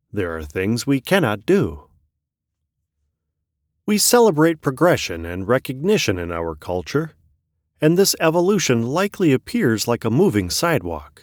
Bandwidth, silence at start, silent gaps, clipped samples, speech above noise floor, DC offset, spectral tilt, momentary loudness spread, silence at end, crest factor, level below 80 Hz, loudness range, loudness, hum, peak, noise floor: over 20 kHz; 0.15 s; none; under 0.1%; 61 dB; under 0.1%; -4.5 dB/octave; 10 LU; 0.15 s; 16 dB; -46 dBFS; 4 LU; -19 LUFS; none; -4 dBFS; -80 dBFS